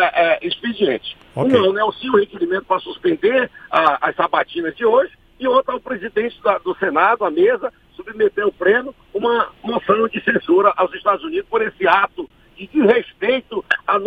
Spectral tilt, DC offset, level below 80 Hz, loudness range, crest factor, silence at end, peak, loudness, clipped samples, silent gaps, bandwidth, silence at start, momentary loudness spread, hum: -7 dB/octave; under 0.1%; -56 dBFS; 1 LU; 18 dB; 0 s; 0 dBFS; -18 LUFS; under 0.1%; none; 5.2 kHz; 0 s; 8 LU; none